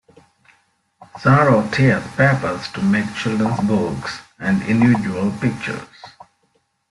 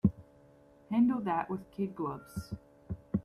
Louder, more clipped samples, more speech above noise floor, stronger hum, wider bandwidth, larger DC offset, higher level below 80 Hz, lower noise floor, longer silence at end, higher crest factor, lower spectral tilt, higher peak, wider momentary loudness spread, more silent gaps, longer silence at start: first, -18 LUFS vs -34 LUFS; neither; first, 48 dB vs 27 dB; neither; second, 11.5 kHz vs 13 kHz; neither; first, -50 dBFS vs -56 dBFS; first, -65 dBFS vs -60 dBFS; first, 0.8 s vs 0.05 s; about the same, 18 dB vs 20 dB; second, -7 dB/octave vs -8.5 dB/octave; first, -2 dBFS vs -14 dBFS; second, 12 LU vs 17 LU; neither; first, 1 s vs 0.05 s